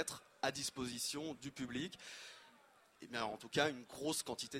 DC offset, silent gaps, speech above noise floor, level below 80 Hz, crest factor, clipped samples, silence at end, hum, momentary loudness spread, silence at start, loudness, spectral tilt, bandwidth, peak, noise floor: under 0.1%; none; 25 dB; -74 dBFS; 26 dB; under 0.1%; 0 s; none; 14 LU; 0 s; -42 LUFS; -2.5 dB/octave; 16 kHz; -18 dBFS; -68 dBFS